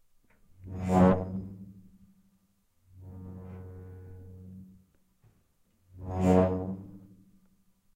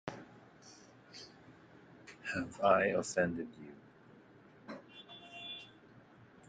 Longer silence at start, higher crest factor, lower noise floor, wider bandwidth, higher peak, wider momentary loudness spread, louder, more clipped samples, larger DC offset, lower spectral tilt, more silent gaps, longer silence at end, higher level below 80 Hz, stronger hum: first, 0.65 s vs 0.05 s; about the same, 22 dB vs 26 dB; first, -70 dBFS vs -60 dBFS; about the same, 9.2 kHz vs 9.4 kHz; first, -10 dBFS vs -14 dBFS; about the same, 26 LU vs 28 LU; first, -27 LUFS vs -35 LUFS; neither; neither; first, -9 dB/octave vs -4.5 dB/octave; neither; first, 0.95 s vs 0.8 s; first, -56 dBFS vs -74 dBFS; neither